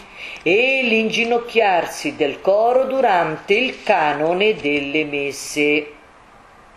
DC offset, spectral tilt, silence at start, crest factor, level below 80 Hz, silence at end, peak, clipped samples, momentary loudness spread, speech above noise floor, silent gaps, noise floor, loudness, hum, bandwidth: under 0.1%; -3.5 dB/octave; 0 s; 18 dB; -56 dBFS; 0.8 s; 0 dBFS; under 0.1%; 7 LU; 29 dB; none; -46 dBFS; -18 LUFS; none; 13 kHz